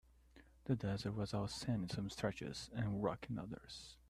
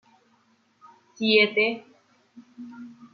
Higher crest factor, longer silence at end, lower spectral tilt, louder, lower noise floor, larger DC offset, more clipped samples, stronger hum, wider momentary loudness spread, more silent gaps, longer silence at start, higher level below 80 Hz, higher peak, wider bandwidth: about the same, 18 dB vs 22 dB; about the same, 0.15 s vs 0.2 s; about the same, -6 dB/octave vs -5 dB/octave; second, -43 LUFS vs -21 LUFS; about the same, -66 dBFS vs -65 dBFS; neither; neither; neither; second, 9 LU vs 25 LU; neither; second, 0.35 s vs 1.2 s; first, -62 dBFS vs -78 dBFS; second, -24 dBFS vs -6 dBFS; first, 13 kHz vs 6.4 kHz